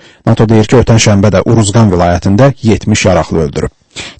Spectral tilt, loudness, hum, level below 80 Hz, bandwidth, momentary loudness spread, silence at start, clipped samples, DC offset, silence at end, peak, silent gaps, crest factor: -6 dB/octave; -8 LUFS; none; -28 dBFS; 8.8 kHz; 7 LU; 0.25 s; 1%; under 0.1%; 0.1 s; 0 dBFS; none; 8 dB